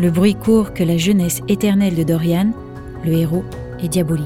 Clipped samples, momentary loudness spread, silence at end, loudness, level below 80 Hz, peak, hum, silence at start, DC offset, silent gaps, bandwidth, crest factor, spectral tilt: under 0.1%; 10 LU; 0 s; -17 LUFS; -40 dBFS; -4 dBFS; none; 0 s; under 0.1%; none; 17 kHz; 12 dB; -6.5 dB/octave